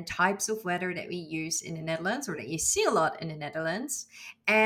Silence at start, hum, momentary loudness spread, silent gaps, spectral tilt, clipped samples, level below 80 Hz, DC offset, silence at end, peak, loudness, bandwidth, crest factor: 0 s; none; 10 LU; none; -3 dB/octave; under 0.1%; -64 dBFS; under 0.1%; 0 s; -10 dBFS; -30 LUFS; 18 kHz; 20 dB